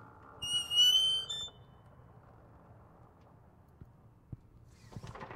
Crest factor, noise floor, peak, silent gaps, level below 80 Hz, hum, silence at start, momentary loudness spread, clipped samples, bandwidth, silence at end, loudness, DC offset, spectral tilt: 20 dB; -60 dBFS; -18 dBFS; none; -64 dBFS; none; 0 s; 30 LU; under 0.1%; 16 kHz; 0 s; -28 LUFS; under 0.1%; -0.5 dB/octave